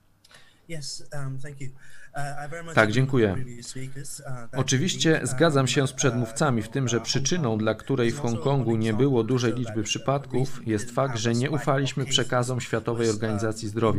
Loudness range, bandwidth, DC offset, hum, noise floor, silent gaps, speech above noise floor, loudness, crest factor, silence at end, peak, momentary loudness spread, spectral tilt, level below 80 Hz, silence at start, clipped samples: 4 LU; 14.5 kHz; under 0.1%; none; -53 dBFS; none; 29 dB; -25 LUFS; 22 dB; 0 s; -4 dBFS; 14 LU; -5 dB/octave; -52 dBFS; 0.35 s; under 0.1%